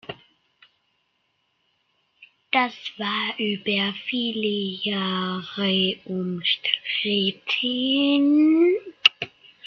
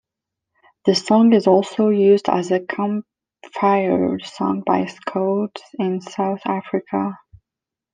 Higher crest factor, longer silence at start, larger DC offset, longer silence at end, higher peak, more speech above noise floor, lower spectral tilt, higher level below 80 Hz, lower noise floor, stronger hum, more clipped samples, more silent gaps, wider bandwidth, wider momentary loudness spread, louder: about the same, 22 dB vs 18 dB; second, 0.1 s vs 0.85 s; neither; second, 0.4 s vs 0.8 s; about the same, -2 dBFS vs -2 dBFS; second, 48 dB vs 68 dB; about the same, -5.5 dB/octave vs -6.5 dB/octave; second, -70 dBFS vs -64 dBFS; second, -71 dBFS vs -86 dBFS; neither; neither; neither; second, 6.6 kHz vs 9.6 kHz; about the same, 10 LU vs 10 LU; second, -22 LUFS vs -19 LUFS